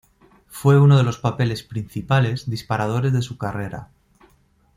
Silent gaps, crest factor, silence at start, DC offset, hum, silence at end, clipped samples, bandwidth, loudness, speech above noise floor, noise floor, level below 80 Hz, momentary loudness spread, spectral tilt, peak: none; 18 dB; 0.55 s; under 0.1%; none; 0.9 s; under 0.1%; 15 kHz; -20 LUFS; 40 dB; -59 dBFS; -52 dBFS; 15 LU; -7 dB/octave; -2 dBFS